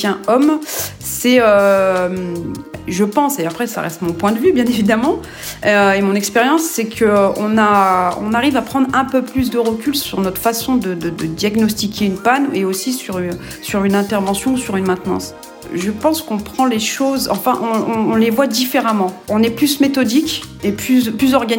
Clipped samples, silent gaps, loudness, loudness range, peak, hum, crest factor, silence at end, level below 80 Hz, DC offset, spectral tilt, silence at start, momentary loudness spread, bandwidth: under 0.1%; none; -16 LUFS; 4 LU; 0 dBFS; none; 16 dB; 0 s; -46 dBFS; under 0.1%; -4.5 dB/octave; 0 s; 9 LU; 19.5 kHz